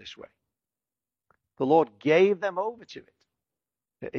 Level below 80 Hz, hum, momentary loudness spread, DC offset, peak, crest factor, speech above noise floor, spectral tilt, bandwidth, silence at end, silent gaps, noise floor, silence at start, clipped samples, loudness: -76 dBFS; none; 23 LU; under 0.1%; -8 dBFS; 20 dB; over 65 dB; -6.5 dB/octave; 6.8 kHz; 0 s; none; under -90 dBFS; 0.05 s; under 0.1%; -24 LUFS